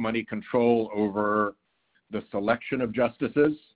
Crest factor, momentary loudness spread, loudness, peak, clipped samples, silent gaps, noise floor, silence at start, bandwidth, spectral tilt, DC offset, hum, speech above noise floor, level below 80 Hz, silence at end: 18 dB; 8 LU; -26 LUFS; -10 dBFS; under 0.1%; none; -71 dBFS; 0 s; 4 kHz; -10.5 dB/octave; under 0.1%; none; 45 dB; -60 dBFS; 0.2 s